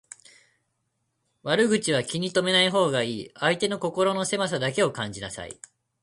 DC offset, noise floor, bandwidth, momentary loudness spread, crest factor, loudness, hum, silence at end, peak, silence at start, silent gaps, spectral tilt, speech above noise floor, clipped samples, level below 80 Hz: under 0.1%; -76 dBFS; 11.5 kHz; 15 LU; 18 dB; -24 LUFS; none; 0.5 s; -8 dBFS; 1.45 s; none; -3.5 dB/octave; 51 dB; under 0.1%; -62 dBFS